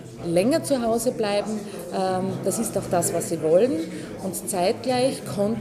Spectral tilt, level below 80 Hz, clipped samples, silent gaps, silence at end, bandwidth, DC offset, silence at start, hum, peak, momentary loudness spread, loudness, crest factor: -5 dB/octave; -56 dBFS; under 0.1%; none; 0 s; 15.5 kHz; under 0.1%; 0 s; none; -8 dBFS; 10 LU; -24 LUFS; 16 dB